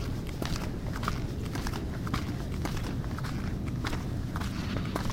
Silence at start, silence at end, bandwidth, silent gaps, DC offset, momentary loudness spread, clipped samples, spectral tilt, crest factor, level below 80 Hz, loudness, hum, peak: 0 s; 0 s; 16.5 kHz; none; under 0.1%; 2 LU; under 0.1%; -6 dB/octave; 20 dB; -38 dBFS; -34 LUFS; none; -12 dBFS